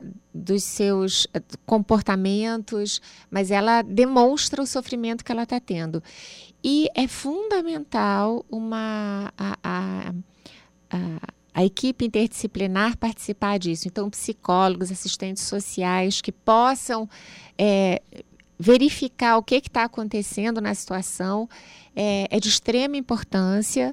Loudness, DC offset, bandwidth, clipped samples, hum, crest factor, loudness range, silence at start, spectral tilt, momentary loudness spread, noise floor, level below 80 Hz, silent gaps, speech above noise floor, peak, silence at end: -23 LUFS; under 0.1%; 15.5 kHz; under 0.1%; none; 18 dB; 5 LU; 0 s; -4.5 dB/octave; 11 LU; -51 dBFS; -52 dBFS; none; 27 dB; -6 dBFS; 0 s